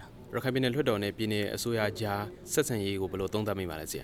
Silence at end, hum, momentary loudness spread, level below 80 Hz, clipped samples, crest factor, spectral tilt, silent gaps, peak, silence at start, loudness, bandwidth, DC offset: 0 s; none; 6 LU; -56 dBFS; under 0.1%; 18 dB; -4.5 dB/octave; none; -14 dBFS; 0 s; -31 LUFS; 18 kHz; under 0.1%